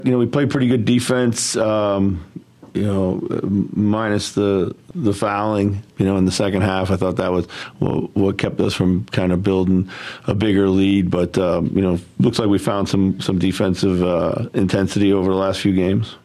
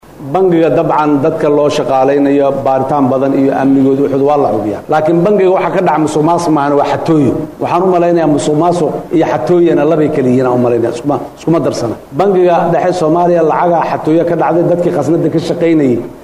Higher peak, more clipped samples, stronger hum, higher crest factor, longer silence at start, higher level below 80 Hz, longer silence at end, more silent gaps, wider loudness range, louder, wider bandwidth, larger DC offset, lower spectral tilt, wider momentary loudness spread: about the same, 0 dBFS vs -2 dBFS; neither; neither; first, 18 dB vs 8 dB; about the same, 0 s vs 0.1 s; about the same, -46 dBFS vs -46 dBFS; about the same, 0.05 s vs 0 s; neither; about the same, 2 LU vs 1 LU; second, -19 LUFS vs -11 LUFS; about the same, 13 kHz vs 12.5 kHz; neither; second, -6 dB/octave vs -7.5 dB/octave; about the same, 5 LU vs 4 LU